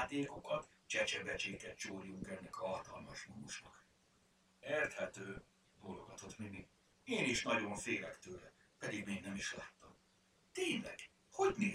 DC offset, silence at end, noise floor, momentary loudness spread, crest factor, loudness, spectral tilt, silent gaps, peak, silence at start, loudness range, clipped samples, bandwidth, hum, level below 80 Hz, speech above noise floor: under 0.1%; 0 s; -74 dBFS; 16 LU; 20 dB; -42 LUFS; -3.5 dB/octave; none; -22 dBFS; 0 s; 5 LU; under 0.1%; 15.5 kHz; none; -70 dBFS; 31 dB